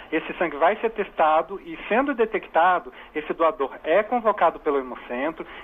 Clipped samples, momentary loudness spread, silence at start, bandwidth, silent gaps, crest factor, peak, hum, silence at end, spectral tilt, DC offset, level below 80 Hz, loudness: under 0.1%; 10 LU; 0 s; 3.8 kHz; none; 16 dB; -8 dBFS; none; 0 s; -7 dB/octave; under 0.1%; -56 dBFS; -23 LUFS